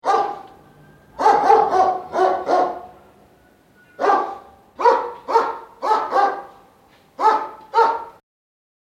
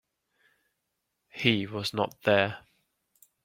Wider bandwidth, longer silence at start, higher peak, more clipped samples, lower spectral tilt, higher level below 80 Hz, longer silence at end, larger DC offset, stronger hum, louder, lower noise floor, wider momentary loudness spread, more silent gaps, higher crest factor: second, 12 kHz vs 16.5 kHz; second, 0.05 s vs 1.35 s; first, -2 dBFS vs -6 dBFS; neither; second, -4 dB/octave vs -5.5 dB/octave; first, -60 dBFS vs -68 dBFS; about the same, 0.85 s vs 0.85 s; neither; neither; first, -19 LUFS vs -27 LUFS; second, -53 dBFS vs -81 dBFS; about the same, 14 LU vs 14 LU; neither; second, 20 dB vs 26 dB